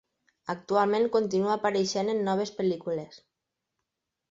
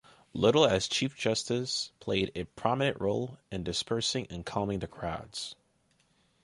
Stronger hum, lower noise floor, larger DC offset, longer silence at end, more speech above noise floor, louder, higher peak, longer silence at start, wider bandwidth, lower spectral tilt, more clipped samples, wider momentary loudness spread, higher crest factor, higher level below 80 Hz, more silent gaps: neither; first, -84 dBFS vs -70 dBFS; neither; first, 1.15 s vs 0.9 s; first, 57 dB vs 40 dB; first, -28 LUFS vs -31 LUFS; about the same, -10 dBFS vs -10 dBFS; about the same, 0.45 s vs 0.35 s; second, 7.8 kHz vs 11.5 kHz; about the same, -5 dB/octave vs -4 dB/octave; neither; about the same, 12 LU vs 13 LU; about the same, 18 dB vs 22 dB; second, -70 dBFS vs -56 dBFS; neither